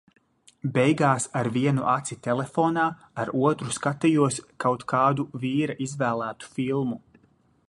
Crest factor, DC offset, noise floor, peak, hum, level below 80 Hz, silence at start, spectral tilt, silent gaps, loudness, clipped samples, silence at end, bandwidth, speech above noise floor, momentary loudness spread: 20 dB; under 0.1%; -63 dBFS; -6 dBFS; none; -64 dBFS; 0.65 s; -6 dB/octave; none; -25 LUFS; under 0.1%; 0.7 s; 11.5 kHz; 38 dB; 8 LU